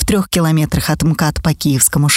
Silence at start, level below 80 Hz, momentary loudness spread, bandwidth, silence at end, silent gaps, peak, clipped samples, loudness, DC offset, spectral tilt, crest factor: 0 s; -30 dBFS; 4 LU; 16.5 kHz; 0 s; none; 0 dBFS; under 0.1%; -14 LUFS; under 0.1%; -4.5 dB/octave; 14 dB